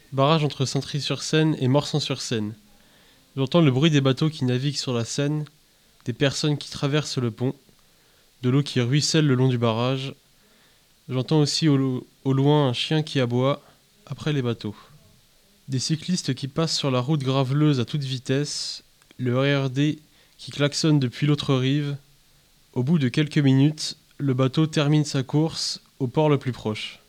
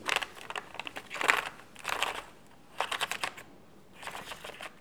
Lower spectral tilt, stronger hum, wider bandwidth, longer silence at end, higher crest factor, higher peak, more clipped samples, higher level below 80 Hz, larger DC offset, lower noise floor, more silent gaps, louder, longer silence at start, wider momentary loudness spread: first, -5.5 dB/octave vs -0.5 dB/octave; neither; second, 12.5 kHz vs over 20 kHz; about the same, 0.1 s vs 0 s; second, 18 dB vs 34 dB; about the same, -4 dBFS vs -2 dBFS; neither; first, -60 dBFS vs -68 dBFS; second, under 0.1% vs 0.1%; about the same, -58 dBFS vs -56 dBFS; neither; first, -23 LUFS vs -34 LUFS; about the same, 0.1 s vs 0 s; second, 11 LU vs 17 LU